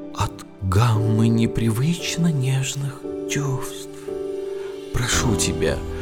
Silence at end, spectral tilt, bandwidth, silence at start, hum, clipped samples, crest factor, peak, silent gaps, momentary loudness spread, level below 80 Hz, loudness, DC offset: 0 s; -5 dB/octave; 17 kHz; 0 s; none; under 0.1%; 16 dB; -6 dBFS; none; 12 LU; -38 dBFS; -22 LUFS; under 0.1%